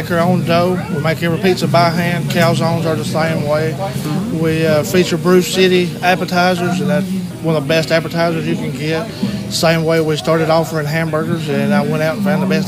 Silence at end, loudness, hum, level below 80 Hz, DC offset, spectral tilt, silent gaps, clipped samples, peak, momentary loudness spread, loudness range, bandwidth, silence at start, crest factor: 0 s; -15 LUFS; none; -48 dBFS; under 0.1%; -5.5 dB/octave; none; under 0.1%; 0 dBFS; 6 LU; 2 LU; 16 kHz; 0 s; 14 dB